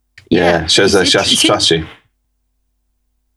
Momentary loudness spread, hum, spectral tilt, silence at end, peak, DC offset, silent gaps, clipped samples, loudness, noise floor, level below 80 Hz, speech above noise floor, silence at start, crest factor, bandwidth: 8 LU; none; -3 dB/octave; 1.45 s; 0 dBFS; under 0.1%; none; under 0.1%; -11 LUFS; -65 dBFS; -42 dBFS; 53 dB; 0.3 s; 14 dB; 13 kHz